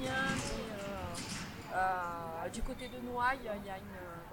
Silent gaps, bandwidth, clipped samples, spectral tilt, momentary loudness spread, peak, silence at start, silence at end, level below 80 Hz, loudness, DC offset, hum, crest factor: none; 18 kHz; under 0.1%; -4 dB/octave; 9 LU; -20 dBFS; 0 s; 0 s; -52 dBFS; -38 LUFS; under 0.1%; none; 18 dB